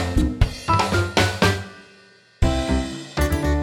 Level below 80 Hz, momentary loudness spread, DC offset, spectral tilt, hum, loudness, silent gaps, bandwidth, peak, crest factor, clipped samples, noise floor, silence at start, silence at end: -26 dBFS; 7 LU; under 0.1%; -5 dB/octave; none; -21 LUFS; none; 17 kHz; -4 dBFS; 18 dB; under 0.1%; -51 dBFS; 0 s; 0 s